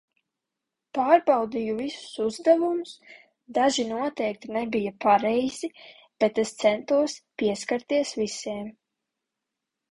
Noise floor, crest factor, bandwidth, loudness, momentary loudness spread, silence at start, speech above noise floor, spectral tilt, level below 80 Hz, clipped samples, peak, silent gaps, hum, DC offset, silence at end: -86 dBFS; 20 dB; 11.5 kHz; -25 LUFS; 12 LU; 0.95 s; 61 dB; -4 dB/octave; -66 dBFS; under 0.1%; -6 dBFS; none; none; under 0.1%; 1.2 s